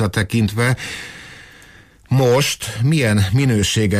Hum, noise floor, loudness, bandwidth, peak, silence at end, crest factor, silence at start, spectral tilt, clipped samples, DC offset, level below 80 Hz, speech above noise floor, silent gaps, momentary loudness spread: none; -46 dBFS; -17 LUFS; 15.5 kHz; -6 dBFS; 0 s; 12 dB; 0 s; -5 dB/octave; under 0.1%; under 0.1%; -42 dBFS; 29 dB; none; 15 LU